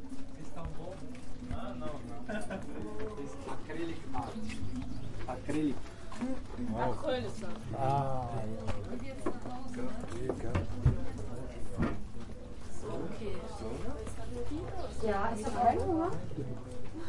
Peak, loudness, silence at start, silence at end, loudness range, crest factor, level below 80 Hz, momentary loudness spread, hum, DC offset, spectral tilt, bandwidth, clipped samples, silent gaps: -14 dBFS; -38 LUFS; 0 s; 0 s; 6 LU; 20 dB; -46 dBFS; 13 LU; none; under 0.1%; -7 dB/octave; 11.5 kHz; under 0.1%; none